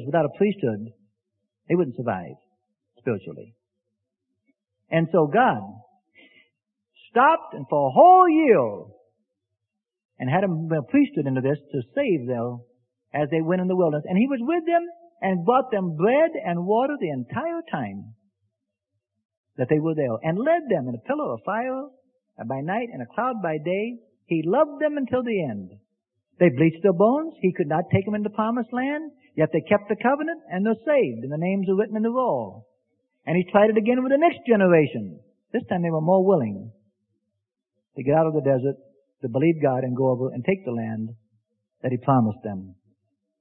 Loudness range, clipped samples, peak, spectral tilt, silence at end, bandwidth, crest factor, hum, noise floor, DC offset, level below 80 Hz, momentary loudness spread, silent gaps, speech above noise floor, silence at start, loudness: 8 LU; under 0.1%; -4 dBFS; -12 dB/octave; 0.7 s; 3.9 kHz; 20 dB; none; -84 dBFS; under 0.1%; -66 dBFS; 13 LU; 10.05-10.09 s, 19.25-19.29 s, 19.37-19.44 s; 62 dB; 0 s; -23 LUFS